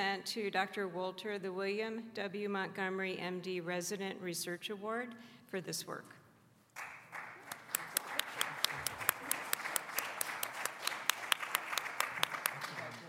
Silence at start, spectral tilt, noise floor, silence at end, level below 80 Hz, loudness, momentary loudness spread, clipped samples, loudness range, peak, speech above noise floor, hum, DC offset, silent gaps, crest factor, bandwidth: 0 s; -2 dB/octave; -66 dBFS; 0 s; -84 dBFS; -38 LUFS; 12 LU; under 0.1%; 7 LU; -8 dBFS; 26 dB; none; under 0.1%; none; 32 dB; 16 kHz